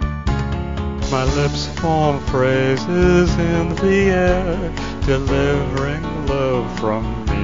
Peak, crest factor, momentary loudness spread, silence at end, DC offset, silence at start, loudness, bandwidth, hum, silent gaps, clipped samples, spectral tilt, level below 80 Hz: -2 dBFS; 16 dB; 8 LU; 0 s; 2%; 0 s; -18 LUFS; 7.6 kHz; none; none; under 0.1%; -6.5 dB/octave; -26 dBFS